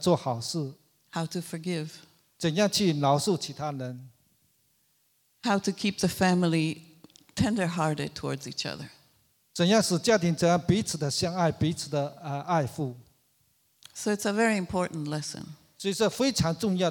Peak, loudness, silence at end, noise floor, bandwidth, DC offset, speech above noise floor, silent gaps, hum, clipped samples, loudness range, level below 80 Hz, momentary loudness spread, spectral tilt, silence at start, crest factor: -10 dBFS; -28 LUFS; 0 s; -69 dBFS; 18.5 kHz; under 0.1%; 42 dB; none; none; under 0.1%; 5 LU; -58 dBFS; 13 LU; -5 dB/octave; 0 s; 18 dB